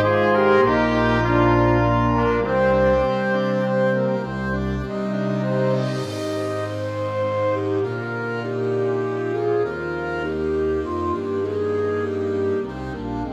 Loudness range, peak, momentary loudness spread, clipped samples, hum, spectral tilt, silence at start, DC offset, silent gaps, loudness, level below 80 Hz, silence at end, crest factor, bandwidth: 6 LU; -6 dBFS; 9 LU; under 0.1%; none; -7.5 dB/octave; 0 s; under 0.1%; none; -21 LUFS; -38 dBFS; 0 s; 16 dB; 12 kHz